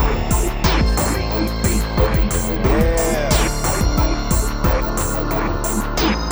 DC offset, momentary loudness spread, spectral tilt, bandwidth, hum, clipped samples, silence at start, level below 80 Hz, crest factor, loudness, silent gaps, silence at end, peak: under 0.1%; 4 LU; -4.5 dB/octave; over 20 kHz; none; under 0.1%; 0 s; -20 dBFS; 16 dB; -19 LUFS; none; 0 s; -2 dBFS